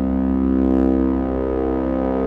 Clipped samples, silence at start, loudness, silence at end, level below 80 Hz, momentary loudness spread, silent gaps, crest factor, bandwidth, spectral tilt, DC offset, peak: under 0.1%; 0 s; -19 LUFS; 0 s; -28 dBFS; 4 LU; none; 12 dB; 4 kHz; -11 dB/octave; under 0.1%; -6 dBFS